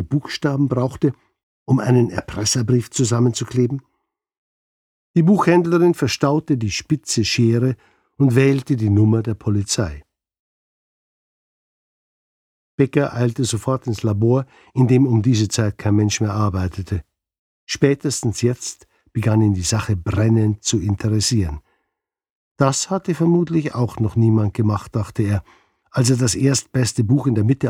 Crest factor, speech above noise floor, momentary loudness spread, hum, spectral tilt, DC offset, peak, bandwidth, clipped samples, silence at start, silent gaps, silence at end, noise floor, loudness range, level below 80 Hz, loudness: 18 dB; 62 dB; 7 LU; none; -6 dB/octave; under 0.1%; 0 dBFS; 14.5 kHz; under 0.1%; 0 s; 1.43-1.66 s, 4.38-5.14 s, 10.39-12.78 s, 17.39-17.67 s, 22.30-22.55 s; 0 s; -79 dBFS; 4 LU; -46 dBFS; -19 LUFS